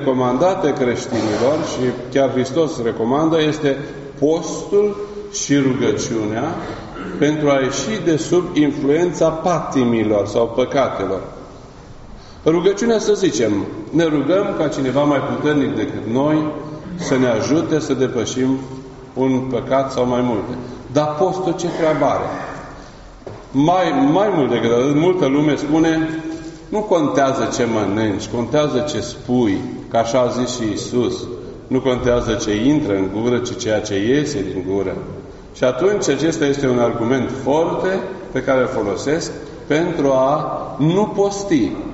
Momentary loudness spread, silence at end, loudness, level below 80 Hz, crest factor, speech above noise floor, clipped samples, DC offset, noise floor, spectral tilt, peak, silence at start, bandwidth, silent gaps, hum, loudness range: 9 LU; 0 s; -18 LUFS; -44 dBFS; 16 dB; 20 dB; under 0.1%; under 0.1%; -38 dBFS; -5.5 dB/octave; -2 dBFS; 0 s; 8 kHz; none; none; 3 LU